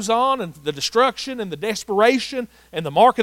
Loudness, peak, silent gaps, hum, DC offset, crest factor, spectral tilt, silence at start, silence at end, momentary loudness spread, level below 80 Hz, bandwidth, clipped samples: -20 LUFS; -2 dBFS; none; none; under 0.1%; 16 dB; -3.5 dB/octave; 0 s; 0 s; 12 LU; -58 dBFS; 16.5 kHz; under 0.1%